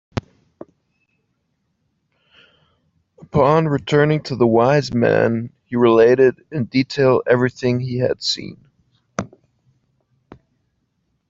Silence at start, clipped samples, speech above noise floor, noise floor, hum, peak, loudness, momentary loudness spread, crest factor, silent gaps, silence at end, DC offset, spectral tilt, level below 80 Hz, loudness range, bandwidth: 0.15 s; under 0.1%; 54 dB; -70 dBFS; none; -2 dBFS; -17 LUFS; 17 LU; 18 dB; none; 2.05 s; under 0.1%; -6.5 dB/octave; -52 dBFS; 10 LU; 7.8 kHz